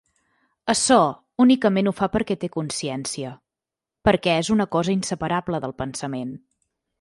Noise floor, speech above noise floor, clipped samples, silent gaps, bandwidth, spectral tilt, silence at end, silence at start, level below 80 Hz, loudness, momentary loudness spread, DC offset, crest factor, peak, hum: -88 dBFS; 67 dB; under 0.1%; none; 11.5 kHz; -4.5 dB/octave; 0.65 s; 0.65 s; -50 dBFS; -22 LUFS; 13 LU; under 0.1%; 20 dB; -4 dBFS; none